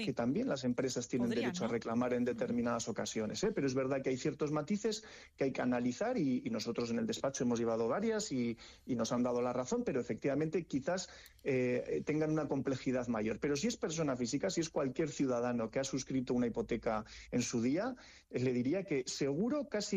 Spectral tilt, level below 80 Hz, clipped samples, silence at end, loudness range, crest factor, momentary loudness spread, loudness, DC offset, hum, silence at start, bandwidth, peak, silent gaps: -5 dB/octave; -64 dBFS; under 0.1%; 0 s; 1 LU; 12 dB; 4 LU; -36 LUFS; under 0.1%; none; 0 s; 10 kHz; -24 dBFS; none